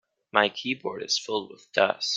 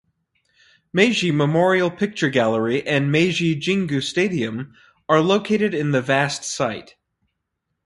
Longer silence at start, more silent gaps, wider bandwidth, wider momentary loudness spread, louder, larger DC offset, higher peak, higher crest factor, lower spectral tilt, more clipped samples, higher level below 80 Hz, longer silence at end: second, 0.35 s vs 0.95 s; neither; second, 9.4 kHz vs 11.5 kHz; about the same, 8 LU vs 8 LU; second, -26 LUFS vs -20 LUFS; neither; about the same, -2 dBFS vs -2 dBFS; first, 26 dB vs 18 dB; second, -2 dB/octave vs -5 dB/octave; neither; second, -74 dBFS vs -60 dBFS; second, 0 s vs 1.05 s